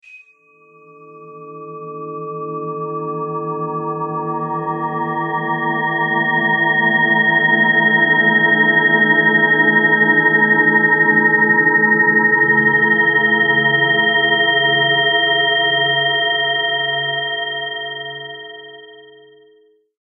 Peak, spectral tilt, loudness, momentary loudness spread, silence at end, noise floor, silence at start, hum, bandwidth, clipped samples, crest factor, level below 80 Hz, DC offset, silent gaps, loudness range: -2 dBFS; -8 dB/octave; -13 LUFS; 14 LU; 1 s; -53 dBFS; 0.1 s; none; 3.5 kHz; under 0.1%; 14 dB; -74 dBFS; under 0.1%; none; 13 LU